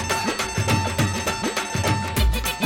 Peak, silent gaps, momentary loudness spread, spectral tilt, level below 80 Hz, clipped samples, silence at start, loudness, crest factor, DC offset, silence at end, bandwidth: -8 dBFS; none; 2 LU; -4 dB/octave; -30 dBFS; under 0.1%; 0 s; -23 LUFS; 14 dB; under 0.1%; 0 s; 17 kHz